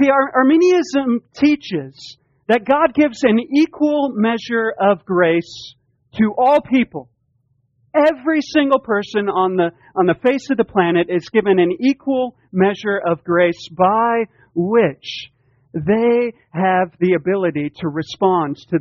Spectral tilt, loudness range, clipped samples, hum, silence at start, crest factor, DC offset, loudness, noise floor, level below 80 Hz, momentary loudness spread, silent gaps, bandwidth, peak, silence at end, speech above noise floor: -5 dB/octave; 2 LU; under 0.1%; none; 0 s; 16 dB; under 0.1%; -17 LUFS; -64 dBFS; -56 dBFS; 10 LU; none; 7.8 kHz; 0 dBFS; 0 s; 47 dB